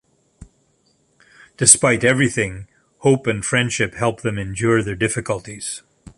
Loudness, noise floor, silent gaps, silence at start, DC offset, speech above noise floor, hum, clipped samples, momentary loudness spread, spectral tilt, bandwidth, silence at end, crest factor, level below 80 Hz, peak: -18 LUFS; -62 dBFS; none; 0.4 s; under 0.1%; 44 dB; none; under 0.1%; 16 LU; -3.5 dB/octave; 15 kHz; 0.4 s; 20 dB; -48 dBFS; 0 dBFS